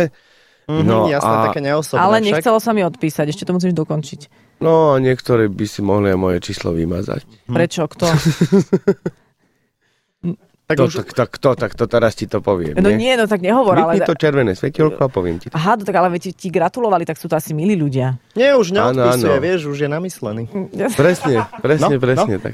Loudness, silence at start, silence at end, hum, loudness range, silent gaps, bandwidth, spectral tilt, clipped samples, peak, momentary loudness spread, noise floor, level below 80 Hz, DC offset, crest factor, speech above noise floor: -16 LUFS; 0 s; 0 s; none; 3 LU; none; 15.5 kHz; -6.5 dB/octave; under 0.1%; -2 dBFS; 9 LU; -65 dBFS; -46 dBFS; under 0.1%; 14 dB; 49 dB